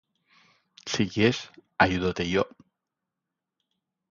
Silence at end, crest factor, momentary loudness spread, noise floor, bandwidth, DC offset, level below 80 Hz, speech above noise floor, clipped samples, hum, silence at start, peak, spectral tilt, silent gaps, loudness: 1.65 s; 24 dB; 12 LU; -86 dBFS; 7.6 kHz; under 0.1%; -52 dBFS; 61 dB; under 0.1%; none; 0.85 s; -4 dBFS; -5 dB/octave; none; -26 LUFS